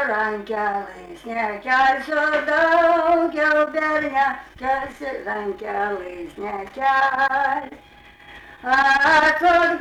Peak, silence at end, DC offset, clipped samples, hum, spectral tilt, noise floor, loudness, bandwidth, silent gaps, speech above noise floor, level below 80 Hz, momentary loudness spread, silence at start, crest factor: -8 dBFS; 0 s; under 0.1%; under 0.1%; none; -4 dB/octave; -44 dBFS; -20 LUFS; 13 kHz; none; 24 dB; -52 dBFS; 15 LU; 0 s; 12 dB